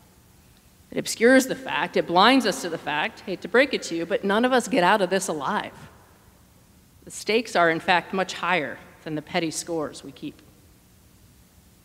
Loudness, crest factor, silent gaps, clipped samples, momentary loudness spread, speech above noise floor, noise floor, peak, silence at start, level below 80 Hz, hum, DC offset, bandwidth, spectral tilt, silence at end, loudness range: -23 LUFS; 24 dB; none; under 0.1%; 16 LU; 32 dB; -55 dBFS; -2 dBFS; 0.95 s; -62 dBFS; none; under 0.1%; 16 kHz; -3.5 dB/octave; 1.55 s; 6 LU